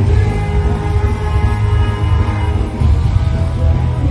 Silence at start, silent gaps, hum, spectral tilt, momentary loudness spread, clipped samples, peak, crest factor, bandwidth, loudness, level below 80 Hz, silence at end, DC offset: 0 s; none; none; -8 dB/octave; 2 LU; under 0.1%; 0 dBFS; 12 dB; 10 kHz; -15 LUFS; -16 dBFS; 0 s; under 0.1%